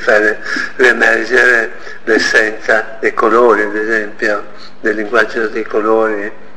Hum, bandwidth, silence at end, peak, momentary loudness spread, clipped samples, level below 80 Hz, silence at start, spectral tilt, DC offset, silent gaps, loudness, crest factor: none; 12 kHz; 0.2 s; 0 dBFS; 9 LU; under 0.1%; -50 dBFS; 0 s; -3 dB/octave; 5%; none; -12 LUFS; 14 dB